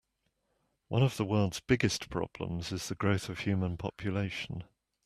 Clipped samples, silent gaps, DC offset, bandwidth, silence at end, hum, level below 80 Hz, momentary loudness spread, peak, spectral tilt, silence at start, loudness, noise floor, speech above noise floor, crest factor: under 0.1%; none; under 0.1%; 14 kHz; 0.4 s; none; -58 dBFS; 8 LU; -12 dBFS; -5.5 dB/octave; 0.9 s; -33 LUFS; -79 dBFS; 48 dB; 22 dB